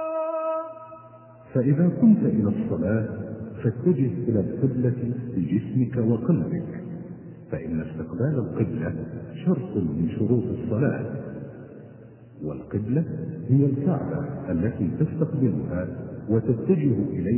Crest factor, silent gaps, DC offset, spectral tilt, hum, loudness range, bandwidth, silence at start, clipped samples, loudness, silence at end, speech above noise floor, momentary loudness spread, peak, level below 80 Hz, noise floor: 16 dB; none; under 0.1%; -13.5 dB/octave; none; 5 LU; 3.2 kHz; 0 s; under 0.1%; -25 LUFS; 0 s; 23 dB; 14 LU; -8 dBFS; -48 dBFS; -47 dBFS